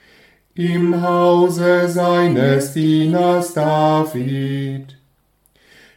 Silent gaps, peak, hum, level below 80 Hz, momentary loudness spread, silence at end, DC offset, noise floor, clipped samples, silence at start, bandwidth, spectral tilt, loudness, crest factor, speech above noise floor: none; -2 dBFS; none; -62 dBFS; 9 LU; 1.05 s; under 0.1%; -60 dBFS; under 0.1%; 0.55 s; 16.5 kHz; -6.5 dB/octave; -16 LUFS; 14 dB; 44 dB